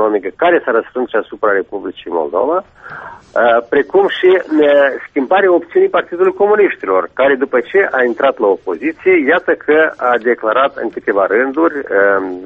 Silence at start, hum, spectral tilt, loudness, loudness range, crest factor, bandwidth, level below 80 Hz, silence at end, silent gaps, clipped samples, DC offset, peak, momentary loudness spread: 0 s; none; -6.5 dB/octave; -13 LUFS; 4 LU; 12 dB; 3.9 kHz; -56 dBFS; 0 s; none; under 0.1%; under 0.1%; 0 dBFS; 8 LU